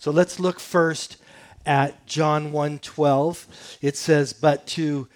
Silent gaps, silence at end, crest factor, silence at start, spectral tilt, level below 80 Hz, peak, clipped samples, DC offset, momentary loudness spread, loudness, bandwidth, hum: none; 0.1 s; 18 dB; 0 s; -5.5 dB/octave; -62 dBFS; -4 dBFS; under 0.1%; under 0.1%; 9 LU; -23 LUFS; 18.5 kHz; none